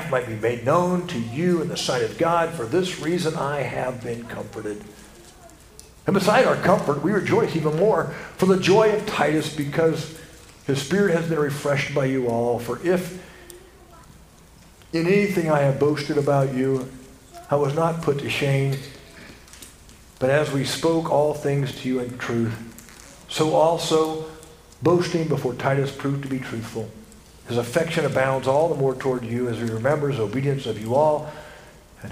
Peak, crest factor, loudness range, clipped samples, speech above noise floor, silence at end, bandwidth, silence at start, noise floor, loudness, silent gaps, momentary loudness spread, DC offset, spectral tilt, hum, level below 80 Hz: -4 dBFS; 20 dB; 5 LU; under 0.1%; 27 dB; 0 s; 15.5 kHz; 0 s; -49 dBFS; -22 LUFS; none; 15 LU; under 0.1%; -6 dB/octave; none; -52 dBFS